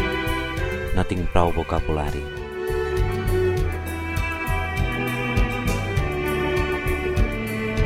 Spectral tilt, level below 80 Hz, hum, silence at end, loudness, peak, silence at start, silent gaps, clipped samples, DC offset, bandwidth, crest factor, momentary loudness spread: -6 dB/octave; -28 dBFS; none; 0 s; -24 LUFS; -4 dBFS; 0 s; none; under 0.1%; under 0.1%; 16.5 kHz; 20 dB; 5 LU